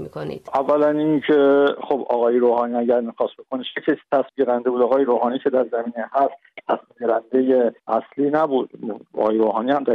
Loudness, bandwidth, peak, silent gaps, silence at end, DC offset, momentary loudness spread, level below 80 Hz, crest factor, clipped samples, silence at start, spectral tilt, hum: -20 LUFS; 5.6 kHz; -6 dBFS; none; 0 s; under 0.1%; 9 LU; -68 dBFS; 14 dB; under 0.1%; 0 s; -8 dB/octave; none